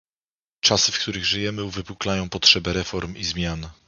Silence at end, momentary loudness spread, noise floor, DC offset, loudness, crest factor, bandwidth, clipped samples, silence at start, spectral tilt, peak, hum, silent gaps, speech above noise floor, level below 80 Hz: 0.15 s; 13 LU; under -90 dBFS; under 0.1%; -21 LUFS; 24 dB; 7.4 kHz; under 0.1%; 0.65 s; -2.5 dB/octave; 0 dBFS; none; none; over 66 dB; -42 dBFS